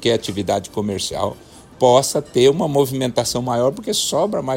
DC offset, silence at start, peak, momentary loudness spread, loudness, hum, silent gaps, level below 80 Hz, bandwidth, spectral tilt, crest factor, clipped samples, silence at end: under 0.1%; 0 s; -2 dBFS; 8 LU; -18 LUFS; none; none; -50 dBFS; 16.5 kHz; -4.5 dB/octave; 18 dB; under 0.1%; 0 s